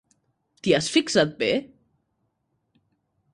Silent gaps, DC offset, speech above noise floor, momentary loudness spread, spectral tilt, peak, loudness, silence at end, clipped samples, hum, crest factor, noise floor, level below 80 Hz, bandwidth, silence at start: none; under 0.1%; 52 dB; 7 LU; -4 dB/octave; -6 dBFS; -23 LUFS; 1.65 s; under 0.1%; none; 22 dB; -74 dBFS; -62 dBFS; 11.5 kHz; 0.65 s